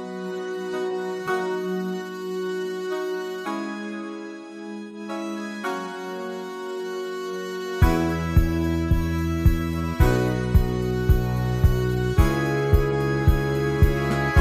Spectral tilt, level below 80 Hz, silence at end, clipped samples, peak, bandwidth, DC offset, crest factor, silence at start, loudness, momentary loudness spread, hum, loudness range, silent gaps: -7 dB/octave; -28 dBFS; 0 s; under 0.1%; -6 dBFS; 16 kHz; under 0.1%; 18 dB; 0 s; -25 LUFS; 11 LU; none; 9 LU; none